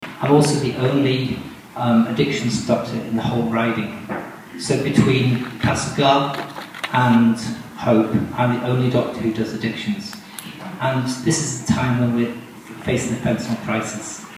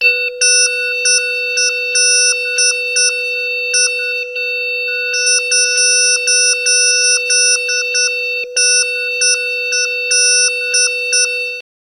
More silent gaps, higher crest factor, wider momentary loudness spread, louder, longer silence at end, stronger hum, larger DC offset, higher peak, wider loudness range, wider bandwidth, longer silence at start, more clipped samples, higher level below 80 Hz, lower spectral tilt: neither; about the same, 18 dB vs 14 dB; first, 13 LU vs 7 LU; second, -20 LUFS vs -11 LUFS; second, 0 s vs 0.25 s; neither; neither; about the same, -2 dBFS vs 0 dBFS; about the same, 4 LU vs 2 LU; about the same, 15.5 kHz vs 16 kHz; about the same, 0 s vs 0 s; neither; first, -50 dBFS vs -66 dBFS; first, -5.5 dB/octave vs 7 dB/octave